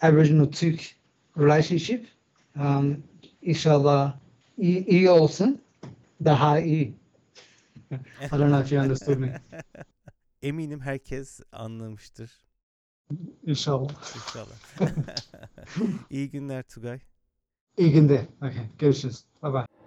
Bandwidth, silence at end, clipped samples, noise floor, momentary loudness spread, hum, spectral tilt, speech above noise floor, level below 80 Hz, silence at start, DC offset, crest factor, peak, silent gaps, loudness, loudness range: 8.2 kHz; 0.2 s; under 0.1%; -74 dBFS; 20 LU; none; -7.5 dB/octave; 51 dB; -56 dBFS; 0 s; under 0.1%; 18 dB; -6 dBFS; 12.63-13.05 s, 17.61-17.67 s; -24 LUFS; 11 LU